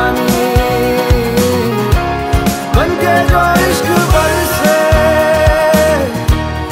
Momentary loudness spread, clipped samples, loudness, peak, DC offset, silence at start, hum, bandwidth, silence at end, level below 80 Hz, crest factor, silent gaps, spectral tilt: 4 LU; under 0.1%; -12 LUFS; 0 dBFS; under 0.1%; 0 s; none; 16.5 kHz; 0 s; -20 dBFS; 12 dB; none; -5 dB/octave